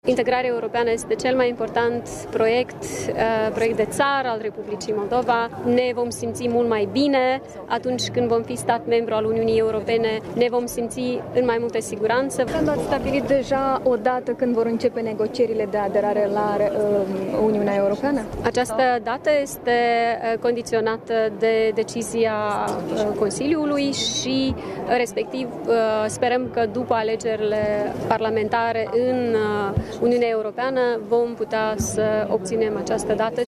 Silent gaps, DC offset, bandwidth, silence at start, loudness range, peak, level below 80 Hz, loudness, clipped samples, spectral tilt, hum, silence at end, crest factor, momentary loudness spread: none; under 0.1%; 14 kHz; 0.05 s; 1 LU; -4 dBFS; -50 dBFS; -22 LUFS; under 0.1%; -4.5 dB/octave; none; 0 s; 16 dB; 5 LU